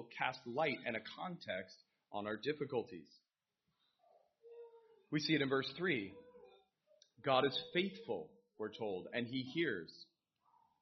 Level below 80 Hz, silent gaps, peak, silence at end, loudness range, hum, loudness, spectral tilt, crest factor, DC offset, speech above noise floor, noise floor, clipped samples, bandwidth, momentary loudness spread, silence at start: -82 dBFS; none; -20 dBFS; 0.8 s; 8 LU; none; -40 LUFS; -3 dB/octave; 22 dB; under 0.1%; 48 dB; -88 dBFS; under 0.1%; 6.2 kHz; 22 LU; 0 s